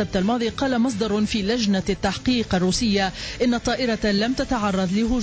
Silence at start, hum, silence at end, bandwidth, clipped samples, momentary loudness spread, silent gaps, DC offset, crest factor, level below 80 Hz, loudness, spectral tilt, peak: 0 s; none; 0 s; 8 kHz; under 0.1%; 2 LU; none; under 0.1%; 12 dB; -40 dBFS; -22 LUFS; -5 dB/octave; -10 dBFS